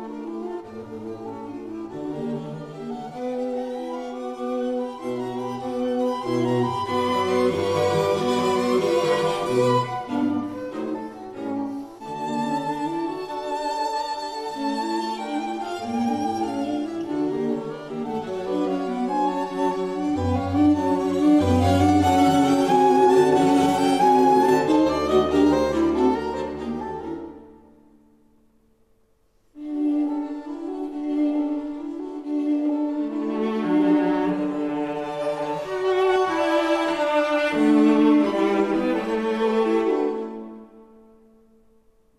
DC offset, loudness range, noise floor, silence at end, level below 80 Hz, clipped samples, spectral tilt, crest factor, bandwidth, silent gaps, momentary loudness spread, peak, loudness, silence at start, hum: under 0.1%; 12 LU; -64 dBFS; 1.35 s; -56 dBFS; under 0.1%; -6 dB/octave; 16 dB; 14 kHz; none; 14 LU; -6 dBFS; -23 LUFS; 0 s; none